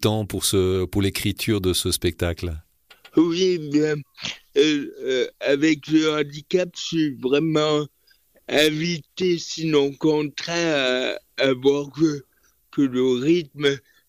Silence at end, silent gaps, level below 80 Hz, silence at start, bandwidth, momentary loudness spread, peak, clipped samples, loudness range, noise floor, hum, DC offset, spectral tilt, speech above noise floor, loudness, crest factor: 0.3 s; none; -48 dBFS; 0 s; 16 kHz; 7 LU; -6 dBFS; under 0.1%; 1 LU; -60 dBFS; none; under 0.1%; -4.5 dB/octave; 38 dB; -22 LUFS; 16 dB